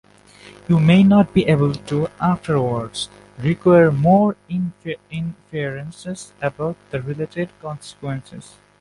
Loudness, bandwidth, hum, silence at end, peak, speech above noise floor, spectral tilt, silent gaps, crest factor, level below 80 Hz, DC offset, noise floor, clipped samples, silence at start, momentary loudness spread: -19 LUFS; 11.5 kHz; 50 Hz at -50 dBFS; 0.4 s; -2 dBFS; 27 dB; -7.5 dB/octave; none; 16 dB; -50 dBFS; under 0.1%; -45 dBFS; under 0.1%; 0.7 s; 18 LU